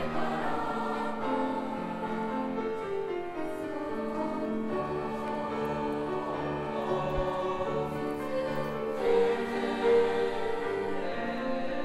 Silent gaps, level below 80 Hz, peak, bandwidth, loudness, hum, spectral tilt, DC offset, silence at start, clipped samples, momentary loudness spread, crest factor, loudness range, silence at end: none; -52 dBFS; -14 dBFS; 13.5 kHz; -32 LUFS; none; -6.5 dB/octave; under 0.1%; 0 s; under 0.1%; 7 LU; 16 dB; 4 LU; 0 s